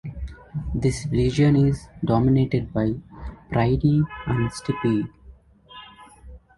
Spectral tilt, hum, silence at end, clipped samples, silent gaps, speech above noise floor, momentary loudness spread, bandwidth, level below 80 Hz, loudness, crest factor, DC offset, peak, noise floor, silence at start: -7.5 dB/octave; none; 0.2 s; under 0.1%; none; 28 dB; 18 LU; 11.5 kHz; -38 dBFS; -23 LUFS; 16 dB; under 0.1%; -6 dBFS; -49 dBFS; 0.05 s